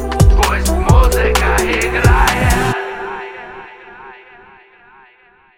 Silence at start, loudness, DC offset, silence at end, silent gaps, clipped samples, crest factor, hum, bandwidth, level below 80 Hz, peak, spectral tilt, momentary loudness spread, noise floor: 0 s; -14 LUFS; under 0.1%; 1.45 s; none; under 0.1%; 14 dB; none; 17 kHz; -18 dBFS; 0 dBFS; -5 dB/octave; 22 LU; -49 dBFS